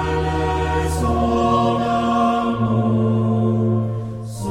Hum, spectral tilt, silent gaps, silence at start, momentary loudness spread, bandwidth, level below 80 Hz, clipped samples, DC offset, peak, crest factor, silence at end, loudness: none; -7.5 dB/octave; none; 0 s; 5 LU; 14 kHz; -32 dBFS; under 0.1%; under 0.1%; -6 dBFS; 12 dB; 0 s; -19 LUFS